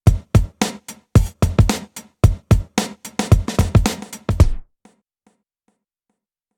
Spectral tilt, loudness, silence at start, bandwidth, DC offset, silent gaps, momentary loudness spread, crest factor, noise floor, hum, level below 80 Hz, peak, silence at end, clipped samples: -6 dB/octave; -19 LUFS; 0.05 s; 17.5 kHz; under 0.1%; none; 10 LU; 18 dB; -76 dBFS; none; -24 dBFS; 0 dBFS; 1.95 s; under 0.1%